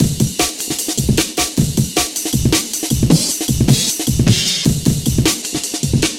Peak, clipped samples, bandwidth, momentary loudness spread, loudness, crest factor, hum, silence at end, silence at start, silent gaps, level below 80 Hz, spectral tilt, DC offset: 0 dBFS; under 0.1%; 17 kHz; 4 LU; -15 LUFS; 16 dB; none; 0 s; 0 s; none; -30 dBFS; -4 dB/octave; under 0.1%